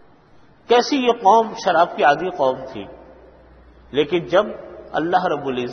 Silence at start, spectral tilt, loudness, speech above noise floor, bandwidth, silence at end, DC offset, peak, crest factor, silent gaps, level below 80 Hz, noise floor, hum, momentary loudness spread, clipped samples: 0.7 s; -4.5 dB/octave; -19 LUFS; 32 dB; 6.6 kHz; 0 s; under 0.1%; -2 dBFS; 18 dB; none; -54 dBFS; -50 dBFS; none; 14 LU; under 0.1%